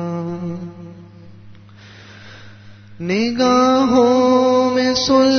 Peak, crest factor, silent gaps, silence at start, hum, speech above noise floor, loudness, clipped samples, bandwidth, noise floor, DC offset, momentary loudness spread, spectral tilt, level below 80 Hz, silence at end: -2 dBFS; 14 dB; none; 0 s; none; 27 dB; -15 LUFS; under 0.1%; 6.6 kHz; -41 dBFS; under 0.1%; 17 LU; -5 dB/octave; -52 dBFS; 0 s